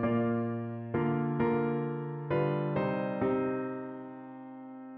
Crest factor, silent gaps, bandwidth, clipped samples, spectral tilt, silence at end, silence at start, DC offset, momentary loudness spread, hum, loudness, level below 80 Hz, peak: 14 dB; none; 4.5 kHz; under 0.1%; -8 dB/octave; 0 s; 0 s; under 0.1%; 16 LU; none; -32 LUFS; -64 dBFS; -18 dBFS